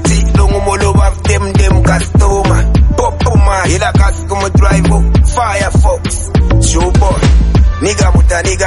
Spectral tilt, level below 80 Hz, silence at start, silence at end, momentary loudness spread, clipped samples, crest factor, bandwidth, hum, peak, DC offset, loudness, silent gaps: -5.5 dB/octave; -12 dBFS; 0 s; 0 s; 3 LU; under 0.1%; 8 dB; 11.5 kHz; none; 0 dBFS; under 0.1%; -10 LUFS; none